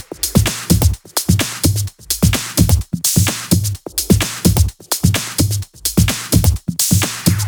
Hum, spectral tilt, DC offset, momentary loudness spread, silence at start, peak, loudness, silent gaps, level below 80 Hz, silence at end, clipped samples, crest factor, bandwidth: none; -4 dB/octave; under 0.1%; 4 LU; 0 s; 0 dBFS; -16 LUFS; none; -26 dBFS; 0 s; under 0.1%; 16 dB; over 20 kHz